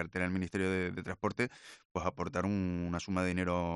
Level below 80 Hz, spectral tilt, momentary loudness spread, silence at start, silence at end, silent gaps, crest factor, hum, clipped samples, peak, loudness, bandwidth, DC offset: -62 dBFS; -6.5 dB/octave; 5 LU; 0 s; 0 s; 1.85-1.95 s; 18 dB; none; under 0.1%; -18 dBFS; -35 LUFS; 11.5 kHz; under 0.1%